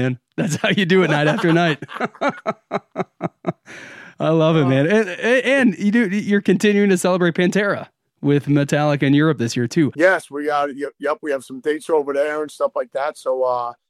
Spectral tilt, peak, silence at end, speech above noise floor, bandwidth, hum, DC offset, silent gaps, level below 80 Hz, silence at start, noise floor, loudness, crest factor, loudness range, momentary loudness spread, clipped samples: -6 dB/octave; -2 dBFS; 0.15 s; 21 dB; 14.5 kHz; none; under 0.1%; none; -68 dBFS; 0 s; -39 dBFS; -19 LUFS; 16 dB; 5 LU; 11 LU; under 0.1%